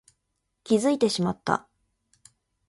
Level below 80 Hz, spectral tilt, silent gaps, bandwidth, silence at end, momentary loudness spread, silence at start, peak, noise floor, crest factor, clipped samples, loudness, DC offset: -64 dBFS; -5 dB/octave; none; 11.5 kHz; 1.1 s; 6 LU; 0.7 s; -6 dBFS; -78 dBFS; 22 dB; under 0.1%; -25 LUFS; under 0.1%